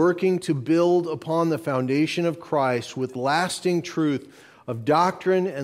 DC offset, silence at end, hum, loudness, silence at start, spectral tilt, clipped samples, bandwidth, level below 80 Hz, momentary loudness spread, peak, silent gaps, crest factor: under 0.1%; 0 s; none; -23 LUFS; 0 s; -6 dB/octave; under 0.1%; 15 kHz; -68 dBFS; 6 LU; -8 dBFS; none; 14 dB